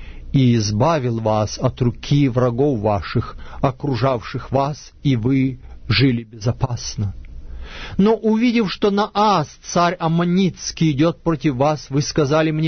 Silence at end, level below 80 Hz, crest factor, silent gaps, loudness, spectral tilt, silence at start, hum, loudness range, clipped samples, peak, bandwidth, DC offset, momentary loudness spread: 0 s; -38 dBFS; 14 dB; none; -19 LUFS; -6.5 dB/octave; 0 s; none; 3 LU; under 0.1%; -4 dBFS; 6.6 kHz; under 0.1%; 8 LU